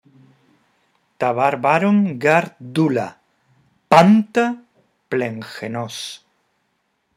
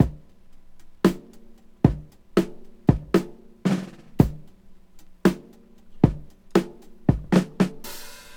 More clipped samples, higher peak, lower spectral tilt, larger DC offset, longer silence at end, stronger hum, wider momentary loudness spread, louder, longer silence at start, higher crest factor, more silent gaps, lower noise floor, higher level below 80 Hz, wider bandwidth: neither; about the same, 0 dBFS vs 0 dBFS; about the same, -6.5 dB/octave vs -7.5 dB/octave; neither; first, 1 s vs 0.05 s; neither; about the same, 17 LU vs 16 LU; first, -18 LUFS vs -24 LUFS; first, 1.2 s vs 0 s; about the same, 20 dB vs 24 dB; neither; first, -69 dBFS vs -48 dBFS; second, -66 dBFS vs -40 dBFS; second, 14 kHz vs 17.5 kHz